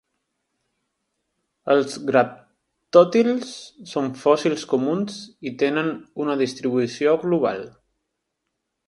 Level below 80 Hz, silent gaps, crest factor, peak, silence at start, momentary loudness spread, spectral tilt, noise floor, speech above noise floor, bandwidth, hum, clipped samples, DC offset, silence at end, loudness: -70 dBFS; none; 22 dB; 0 dBFS; 1.65 s; 15 LU; -5.5 dB/octave; -79 dBFS; 58 dB; 11.5 kHz; none; under 0.1%; under 0.1%; 1.2 s; -21 LUFS